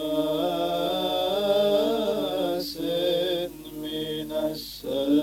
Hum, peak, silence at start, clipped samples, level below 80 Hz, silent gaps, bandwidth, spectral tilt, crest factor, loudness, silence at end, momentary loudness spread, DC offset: none; -10 dBFS; 0 s; under 0.1%; -54 dBFS; none; 17 kHz; -5 dB/octave; 14 dB; -26 LUFS; 0 s; 8 LU; under 0.1%